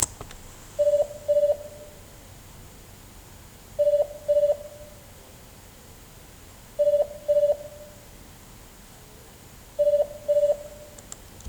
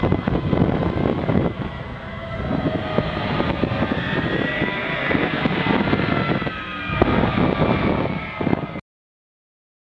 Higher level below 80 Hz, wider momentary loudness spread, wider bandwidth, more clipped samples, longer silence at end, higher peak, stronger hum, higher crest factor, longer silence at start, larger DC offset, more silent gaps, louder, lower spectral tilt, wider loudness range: second, -52 dBFS vs -38 dBFS; first, 24 LU vs 8 LU; first, over 20 kHz vs 7.2 kHz; neither; second, 0 s vs 1.2 s; second, -4 dBFS vs 0 dBFS; neither; about the same, 24 dB vs 22 dB; about the same, 0 s vs 0 s; neither; neither; about the same, -24 LUFS vs -22 LUFS; second, -3.5 dB/octave vs -8.5 dB/octave; second, 0 LU vs 3 LU